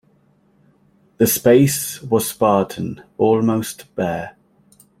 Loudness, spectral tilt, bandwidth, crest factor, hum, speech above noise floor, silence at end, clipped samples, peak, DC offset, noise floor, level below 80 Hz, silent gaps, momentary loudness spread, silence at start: -18 LUFS; -5.5 dB/octave; 16.5 kHz; 18 dB; none; 40 dB; 0.7 s; under 0.1%; -2 dBFS; under 0.1%; -57 dBFS; -56 dBFS; none; 15 LU; 1.2 s